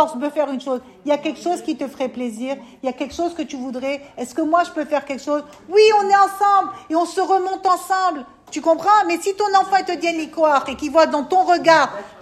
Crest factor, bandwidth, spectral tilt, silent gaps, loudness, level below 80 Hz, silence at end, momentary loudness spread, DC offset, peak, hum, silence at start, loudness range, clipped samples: 18 dB; 14 kHz; -3 dB/octave; none; -19 LUFS; -60 dBFS; 0.1 s; 12 LU; under 0.1%; 0 dBFS; none; 0 s; 7 LU; under 0.1%